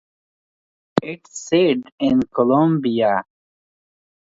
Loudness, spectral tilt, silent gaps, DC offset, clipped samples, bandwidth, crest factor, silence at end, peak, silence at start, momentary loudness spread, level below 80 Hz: -19 LUFS; -6 dB/octave; 1.92-1.98 s; under 0.1%; under 0.1%; 7.8 kHz; 20 dB; 1 s; 0 dBFS; 0.95 s; 8 LU; -58 dBFS